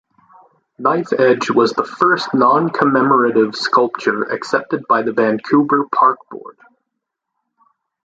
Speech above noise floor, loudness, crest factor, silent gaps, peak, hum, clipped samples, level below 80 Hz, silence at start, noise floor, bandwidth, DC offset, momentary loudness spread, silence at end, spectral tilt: 62 dB; -15 LUFS; 16 dB; none; 0 dBFS; none; under 0.1%; -62 dBFS; 0.8 s; -78 dBFS; 9 kHz; under 0.1%; 6 LU; 1.55 s; -6 dB/octave